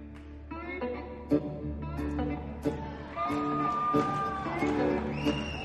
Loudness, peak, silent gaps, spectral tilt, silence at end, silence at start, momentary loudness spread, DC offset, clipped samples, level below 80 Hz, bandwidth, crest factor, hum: -32 LUFS; -14 dBFS; none; -7 dB/octave; 0 s; 0 s; 11 LU; under 0.1%; under 0.1%; -44 dBFS; 12.5 kHz; 18 dB; none